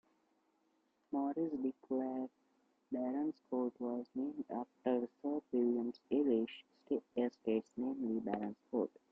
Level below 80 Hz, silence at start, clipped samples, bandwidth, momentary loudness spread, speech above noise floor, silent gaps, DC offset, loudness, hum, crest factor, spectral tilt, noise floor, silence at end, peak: -82 dBFS; 1.1 s; under 0.1%; 6 kHz; 7 LU; 40 dB; none; under 0.1%; -39 LUFS; none; 16 dB; -8.5 dB/octave; -78 dBFS; 0.25 s; -22 dBFS